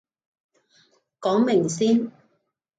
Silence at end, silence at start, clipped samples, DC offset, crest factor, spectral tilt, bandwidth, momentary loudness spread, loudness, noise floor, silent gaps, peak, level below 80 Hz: 0.7 s; 1.2 s; under 0.1%; under 0.1%; 16 dB; -5.5 dB/octave; 9.2 kHz; 9 LU; -22 LUFS; -72 dBFS; none; -10 dBFS; -72 dBFS